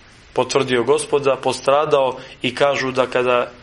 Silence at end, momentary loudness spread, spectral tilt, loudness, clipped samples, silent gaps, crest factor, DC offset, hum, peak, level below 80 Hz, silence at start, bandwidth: 0.05 s; 7 LU; -4 dB/octave; -18 LUFS; under 0.1%; none; 18 dB; under 0.1%; none; 0 dBFS; -54 dBFS; 0.35 s; 11.5 kHz